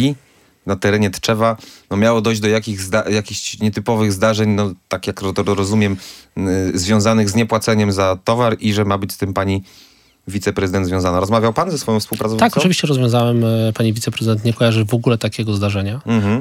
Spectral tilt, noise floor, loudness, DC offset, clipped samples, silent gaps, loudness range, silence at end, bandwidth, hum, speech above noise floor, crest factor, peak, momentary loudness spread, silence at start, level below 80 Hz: -5.5 dB/octave; -51 dBFS; -17 LUFS; under 0.1%; under 0.1%; none; 3 LU; 0 s; 16.5 kHz; none; 34 dB; 16 dB; 0 dBFS; 7 LU; 0 s; -52 dBFS